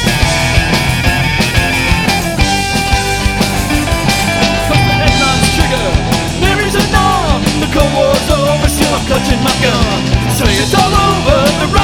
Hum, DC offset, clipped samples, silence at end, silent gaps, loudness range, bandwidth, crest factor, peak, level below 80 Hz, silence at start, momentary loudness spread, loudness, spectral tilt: none; under 0.1%; 0.1%; 0 s; none; 1 LU; 19.5 kHz; 12 dB; 0 dBFS; -20 dBFS; 0 s; 3 LU; -11 LUFS; -4.5 dB/octave